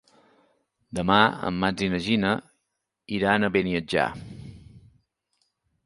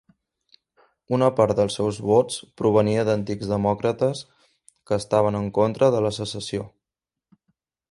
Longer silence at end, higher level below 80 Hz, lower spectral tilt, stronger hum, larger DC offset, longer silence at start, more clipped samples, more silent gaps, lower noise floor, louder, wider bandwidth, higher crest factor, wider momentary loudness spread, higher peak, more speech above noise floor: second, 1.05 s vs 1.25 s; about the same, -52 dBFS vs -54 dBFS; about the same, -5.5 dB/octave vs -6 dB/octave; neither; neither; second, 0.9 s vs 1.1 s; neither; neither; second, -80 dBFS vs -88 dBFS; about the same, -24 LUFS vs -22 LUFS; about the same, 11.5 kHz vs 11.5 kHz; about the same, 24 dB vs 20 dB; first, 19 LU vs 10 LU; about the same, -2 dBFS vs -4 dBFS; second, 57 dB vs 67 dB